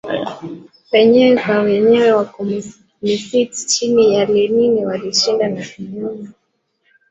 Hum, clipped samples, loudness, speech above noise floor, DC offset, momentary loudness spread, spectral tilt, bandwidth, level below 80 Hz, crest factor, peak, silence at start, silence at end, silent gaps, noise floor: none; under 0.1%; -15 LUFS; 52 dB; under 0.1%; 15 LU; -4 dB/octave; 8.2 kHz; -58 dBFS; 14 dB; -2 dBFS; 0.05 s; 0.8 s; none; -67 dBFS